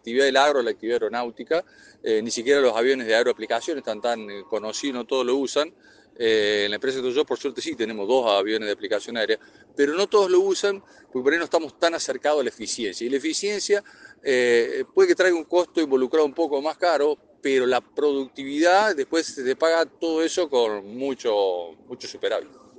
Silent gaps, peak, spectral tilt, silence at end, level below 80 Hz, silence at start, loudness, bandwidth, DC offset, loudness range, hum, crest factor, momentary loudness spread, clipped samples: none; -4 dBFS; -2.5 dB/octave; 0.3 s; -72 dBFS; 0.05 s; -23 LUFS; 9.8 kHz; under 0.1%; 3 LU; none; 20 dB; 10 LU; under 0.1%